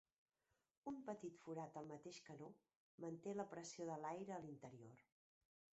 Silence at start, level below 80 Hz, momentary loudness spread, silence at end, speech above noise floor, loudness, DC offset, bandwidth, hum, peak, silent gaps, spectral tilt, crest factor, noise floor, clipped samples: 0.85 s; under -90 dBFS; 10 LU; 0.75 s; over 37 dB; -54 LUFS; under 0.1%; 8 kHz; none; -34 dBFS; 2.76-2.98 s; -6 dB/octave; 20 dB; under -90 dBFS; under 0.1%